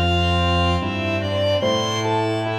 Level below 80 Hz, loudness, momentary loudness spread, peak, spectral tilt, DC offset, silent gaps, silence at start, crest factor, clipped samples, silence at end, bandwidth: -36 dBFS; -20 LUFS; 4 LU; -8 dBFS; -5.5 dB/octave; under 0.1%; none; 0 s; 12 dB; under 0.1%; 0 s; 12 kHz